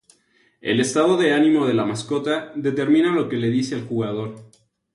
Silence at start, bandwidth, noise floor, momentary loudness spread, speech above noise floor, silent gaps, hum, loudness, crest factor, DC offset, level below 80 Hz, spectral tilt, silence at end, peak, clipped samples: 0.65 s; 11.5 kHz; -61 dBFS; 8 LU; 41 dB; none; none; -20 LUFS; 16 dB; under 0.1%; -62 dBFS; -5.5 dB/octave; 0.5 s; -6 dBFS; under 0.1%